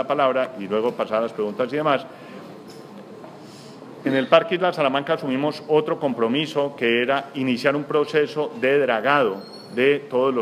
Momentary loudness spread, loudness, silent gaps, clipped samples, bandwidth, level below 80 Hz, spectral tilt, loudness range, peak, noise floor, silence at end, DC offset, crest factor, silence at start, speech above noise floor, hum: 22 LU; -21 LUFS; none; under 0.1%; 14 kHz; -74 dBFS; -6 dB/octave; 5 LU; -2 dBFS; -41 dBFS; 0 s; under 0.1%; 20 dB; 0 s; 20 dB; none